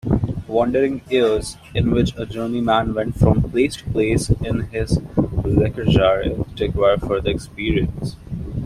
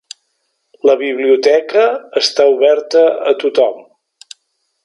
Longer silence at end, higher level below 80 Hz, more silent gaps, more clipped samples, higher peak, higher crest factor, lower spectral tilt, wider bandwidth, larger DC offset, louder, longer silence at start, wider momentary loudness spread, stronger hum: second, 0 s vs 1.05 s; first, -32 dBFS vs -72 dBFS; neither; neither; about the same, -2 dBFS vs 0 dBFS; about the same, 18 dB vs 14 dB; first, -7 dB/octave vs -2 dB/octave; first, 13.5 kHz vs 11 kHz; neither; second, -20 LUFS vs -13 LUFS; second, 0.05 s vs 0.85 s; about the same, 7 LU vs 5 LU; neither